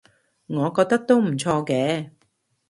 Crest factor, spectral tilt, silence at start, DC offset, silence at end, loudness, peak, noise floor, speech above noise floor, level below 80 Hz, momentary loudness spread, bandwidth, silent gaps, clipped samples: 18 dB; -6 dB/octave; 0.5 s; under 0.1%; 0.6 s; -22 LUFS; -4 dBFS; -68 dBFS; 47 dB; -64 dBFS; 11 LU; 11.5 kHz; none; under 0.1%